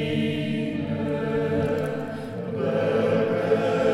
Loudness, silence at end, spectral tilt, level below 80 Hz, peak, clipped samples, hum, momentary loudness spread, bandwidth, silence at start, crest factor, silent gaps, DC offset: -25 LUFS; 0 s; -7.5 dB/octave; -54 dBFS; -8 dBFS; under 0.1%; none; 8 LU; 13.5 kHz; 0 s; 16 dB; none; under 0.1%